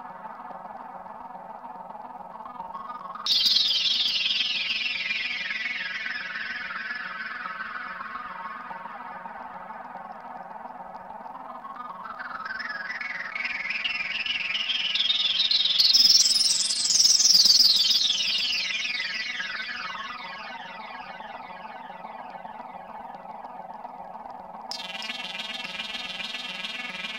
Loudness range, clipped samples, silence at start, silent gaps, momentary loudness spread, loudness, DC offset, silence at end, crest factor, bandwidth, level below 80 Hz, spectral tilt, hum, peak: 22 LU; under 0.1%; 0 s; none; 23 LU; -22 LUFS; under 0.1%; 0 s; 20 dB; 16 kHz; -68 dBFS; 2 dB/octave; none; -8 dBFS